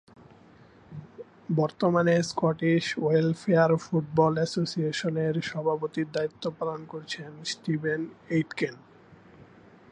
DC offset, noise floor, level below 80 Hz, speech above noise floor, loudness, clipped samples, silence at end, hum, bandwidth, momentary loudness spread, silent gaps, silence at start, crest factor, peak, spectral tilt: under 0.1%; -54 dBFS; -66 dBFS; 28 dB; -27 LUFS; under 0.1%; 0.5 s; none; 10 kHz; 13 LU; none; 0.9 s; 20 dB; -8 dBFS; -6 dB/octave